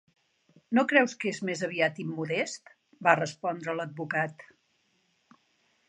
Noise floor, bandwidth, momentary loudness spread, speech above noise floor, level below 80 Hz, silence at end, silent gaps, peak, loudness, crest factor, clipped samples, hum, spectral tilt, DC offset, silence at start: -72 dBFS; 10 kHz; 11 LU; 43 dB; -82 dBFS; 1.45 s; none; -6 dBFS; -28 LUFS; 24 dB; under 0.1%; none; -5 dB/octave; under 0.1%; 0.7 s